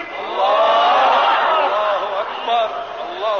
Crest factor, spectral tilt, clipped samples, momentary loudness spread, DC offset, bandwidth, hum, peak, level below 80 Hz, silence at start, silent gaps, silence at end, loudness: 12 dB; -2.5 dB/octave; under 0.1%; 10 LU; 0.1%; 6.8 kHz; none; -6 dBFS; -66 dBFS; 0 s; none; 0 s; -16 LUFS